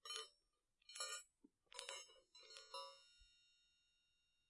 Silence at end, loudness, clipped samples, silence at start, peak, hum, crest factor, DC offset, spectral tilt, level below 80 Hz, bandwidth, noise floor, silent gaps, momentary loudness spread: 0.85 s; -54 LUFS; under 0.1%; 0.05 s; -28 dBFS; none; 32 dB; under 0.1%; 2 dB/octave; -88 dBFS; 12 kHz; -86 dBFS; none; 17 LU